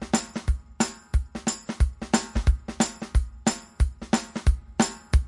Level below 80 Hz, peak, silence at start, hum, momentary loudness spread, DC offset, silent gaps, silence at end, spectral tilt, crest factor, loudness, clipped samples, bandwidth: -28 dBFS; -6 dBFS; 0 s; none; 5 LU; under 0.1%; none; 0 s; -4.5 dB/octave; 18 dB; -27 LUFS; under 0.1%; 11.5 kHz